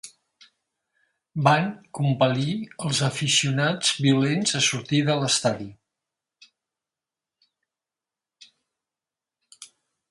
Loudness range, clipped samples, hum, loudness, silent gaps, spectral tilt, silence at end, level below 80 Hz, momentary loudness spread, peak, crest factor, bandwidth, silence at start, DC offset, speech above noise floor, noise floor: 7 LU; under 0.1%; none; -22 LUFS; none; -4 dB/octave; 0.45 s; -66 dBFS; 10 LU; -4 dBFS; 22 dB; 11.5 kHz; 0.05 s; under 0.1%; 67 dB; -90 dBFS